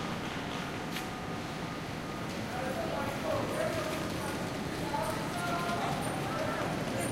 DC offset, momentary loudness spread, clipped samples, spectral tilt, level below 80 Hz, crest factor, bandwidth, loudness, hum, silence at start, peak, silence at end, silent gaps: under 0.1%; 5 LU; under 0.1%; -5 dB/octave; -54 dBFS; 14 dB; 16.5 kHz; -35 LUFS; none; 0 s; -20 dBFS; 0 s; none